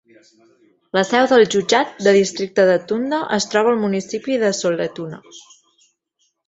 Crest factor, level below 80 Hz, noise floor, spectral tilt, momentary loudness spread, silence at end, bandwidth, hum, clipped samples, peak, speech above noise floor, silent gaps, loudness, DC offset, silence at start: 18 dB; -62 dBFS; -68 dBFS; -4 dB/octave; 9 LU; 1.05 s; 8.2 kHz; none; under 0.1%; 0 dBFS; 50 dB; none; -17 LUFS; under 0.1%; 0.95 s